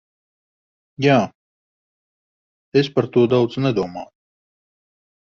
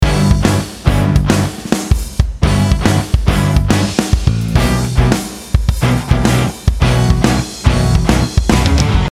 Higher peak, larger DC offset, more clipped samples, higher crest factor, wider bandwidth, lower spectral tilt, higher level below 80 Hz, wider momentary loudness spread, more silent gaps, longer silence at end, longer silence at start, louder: about the same, -2 dBFS vs 0 dBFS; second, under 0.1% vs 0.2%; second, under 0.1% vs 0.1%; first, 20 dB vs 12 dB; second, 7.2 kHz vs 15.5 kHz; first, -7.5 dB/octave vs -5.5 dB/octave; second, -60 dBFS vs -18 dBFS; first, 12 LU vs 4 LU; first, 1.35-2.72 s vs none; first, 1.25 s vs 0 s; first, 1 s vs 0 s; second, -19 LUFS vs -14 LUFS